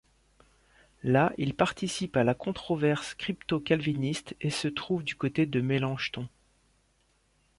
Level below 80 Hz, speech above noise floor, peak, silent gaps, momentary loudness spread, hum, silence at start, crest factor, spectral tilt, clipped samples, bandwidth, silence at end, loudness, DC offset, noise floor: -60 dBFS; 40 dB; -10 dBFS; none; 7 LU; none; 1.05 s; 20 dB; -6 dB/octave; under 0.1%; 11.5 kHz; 1.3 s; -29 LUFS; under 0.1%; -69 dBFS